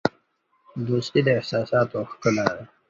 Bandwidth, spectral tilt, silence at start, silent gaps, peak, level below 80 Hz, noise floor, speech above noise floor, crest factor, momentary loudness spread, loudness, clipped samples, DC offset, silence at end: 7.8 kHz; -6 dB/octave; 0.05 s; none; -2 dBFS; -58 dBFS; -67 dBFS; 44 dB; 22 dB; 7 LU; -24 LUFS; under 0.1%; under 0.1%; 0.25 s